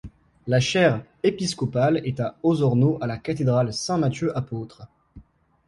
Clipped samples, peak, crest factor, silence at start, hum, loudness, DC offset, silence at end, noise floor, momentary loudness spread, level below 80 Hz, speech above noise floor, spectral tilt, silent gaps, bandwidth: under 0.1%; -6 dBFS; 18 dB; 0.05 s; none; -23 LUFS; under 0.1%; 0.45 s; -50 dBFS; 9 LU; -54 dBFS; 28 dB; -6 dB/octave; none; 11.5 kHz